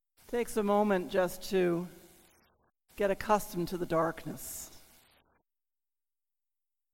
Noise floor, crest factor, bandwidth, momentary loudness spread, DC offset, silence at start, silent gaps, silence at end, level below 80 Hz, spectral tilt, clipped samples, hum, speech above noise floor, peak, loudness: under -90 dBFS; 20 dB; 17 kHz; 13 LU; under 0.1%; 0.3 s; none; 2.15 s; -58 dBFS; -5.5 dB/octave; under 0.1%; none; over 59 dB; -14 dBFS; -32 LUFS